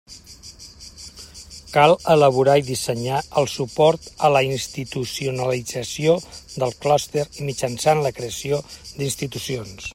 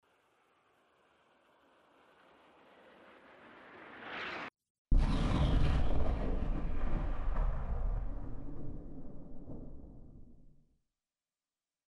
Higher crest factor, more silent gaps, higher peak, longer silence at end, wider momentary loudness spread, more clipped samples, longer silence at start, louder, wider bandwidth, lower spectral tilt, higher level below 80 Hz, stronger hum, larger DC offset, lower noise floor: about the same, 20 dB vs 18 dB; second, none vs 4.70-4.85 s; first, 0 dBFS vs -18 dBFS; second, 0 s vs 1.4 s; about the same, 22 LU vs 24 LU; neither; second, 0.1 s vs 3.45 s; first, -21 LUFS vs -38 LUFS; first, 16 kHz vs 6.6 kHz; second, -4.5 dB/octave vs -7.5 dB/octave; second, -50 dBFS vs -38 dBFS; neither; neither; second, -42 dBFS vs under -90 dBFS